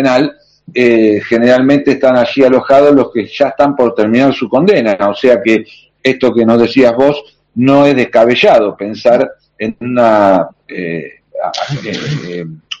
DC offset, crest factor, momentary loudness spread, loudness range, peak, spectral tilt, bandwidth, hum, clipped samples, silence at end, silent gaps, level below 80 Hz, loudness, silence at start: under 0.1%; 10 dB; 13 LU; 4 LU; 0 dBFS; -6.5 dB/octave; 8 kHz; none; 0.9%; 0.05 s; none; -50 dBFS; -10 LUFS; 0 s